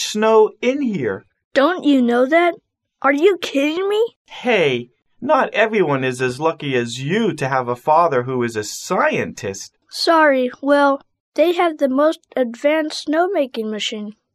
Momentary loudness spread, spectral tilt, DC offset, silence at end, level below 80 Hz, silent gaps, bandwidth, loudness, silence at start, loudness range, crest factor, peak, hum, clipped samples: 10 LU; -4.5 dB/octave; under 0.1%; 0.25 s; -66 dBFS; 1.44-1.51 s, 4.16-4.25 s, 11.20-11.32 s; 14 kHz; -18 LUFS; 0 s; 2 LU; 16 dB; -2 dBFS; none; under 0.1%